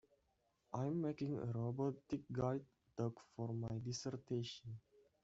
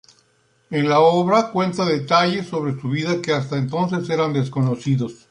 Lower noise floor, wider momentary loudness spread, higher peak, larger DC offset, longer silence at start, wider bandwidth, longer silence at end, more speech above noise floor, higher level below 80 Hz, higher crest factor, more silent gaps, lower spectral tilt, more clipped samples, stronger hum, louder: first, -82 dBFS vs -61 dBFS; about the same, 8 LU vs 9 LU; second, -26 dBFS vs -2 dBFS; neither; about the same, 0.7 s vs 0.7 s; second, 8 kHz vs 10.5 kHz; first, 0.45 s vs 0.15 s; about the same, 39 dB vs 42 dB; second, -74 dBFS vs -62 dBFS; about the same, 18 dB vs 18 dB; neither; about the same, -7.5 dB/octave vs -6.5 dB/octave; neither; neither; second, -44 LUFS vs -20 LUFS